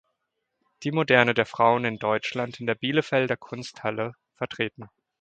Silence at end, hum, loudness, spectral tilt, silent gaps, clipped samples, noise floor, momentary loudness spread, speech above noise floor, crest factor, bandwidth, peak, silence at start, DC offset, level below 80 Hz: 0.35 s; none; -25 LUFS; -5.5 dB/octave; none; under 0.1%; -80 dBFS; 14 LU; 55 dB; 26 dB; 9 kHz; 0 dBFS; 0.8 s; under 0.1%; -66 dBFS